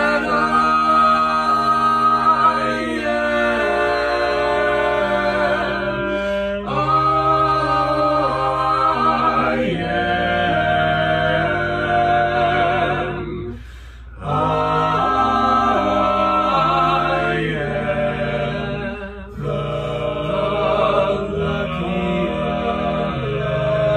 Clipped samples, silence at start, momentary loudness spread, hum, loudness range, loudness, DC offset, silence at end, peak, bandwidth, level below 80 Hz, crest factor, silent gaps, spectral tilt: under 0.1%; 0 s; 8 LU; none; 5 LU; -18 LUFS; under 0.1%; 0 s; -4 dBFS; 13 kHz; -38 dBFS; 14 dB; none; -6.5 dB/octave